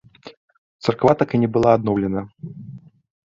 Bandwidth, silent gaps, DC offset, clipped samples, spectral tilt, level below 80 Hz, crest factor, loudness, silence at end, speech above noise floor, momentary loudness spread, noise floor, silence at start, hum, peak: 7.6 kHz; 0.37-0.48 s, 0.58-0.79 s; under 0.1%; under 0.1%; -8 dB/octave; -50 dBFS; 20 dB; -19 LUFS; 0.55 s; 22 dB; 20 LU; -40 dBFS; 0.25 s; none; -2 dBFS